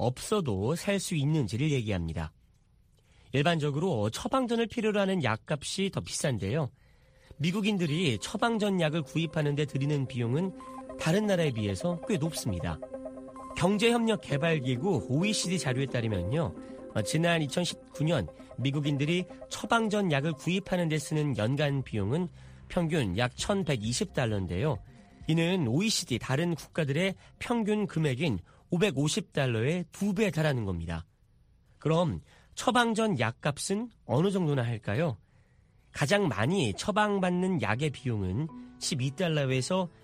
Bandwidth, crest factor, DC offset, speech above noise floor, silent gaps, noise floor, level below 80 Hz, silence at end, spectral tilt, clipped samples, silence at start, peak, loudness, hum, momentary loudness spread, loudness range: 15.5 kHz; 22 dB; under 0.1%; 34 dB; none; -63 dBFS; -56 dBFS; 0.15 s; -5.5 dB/octave; under 0.1%; 0 s; -8 dBFS; -30 LUFS; none; 8 LU; 2 LU